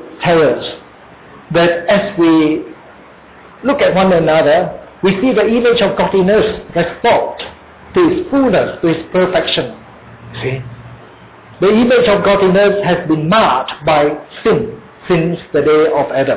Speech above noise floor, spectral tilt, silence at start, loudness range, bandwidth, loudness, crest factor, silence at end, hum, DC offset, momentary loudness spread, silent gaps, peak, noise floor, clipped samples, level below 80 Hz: 27 dB; -10 dB/octave; 0 s; 4 LU; 4 kHz; -13 LUFS; 12 dB; 0 s; none; under 0.1%; 11 LU; none; -2 dBFS; -39 dBFS; under 0.1%; -42 dBFS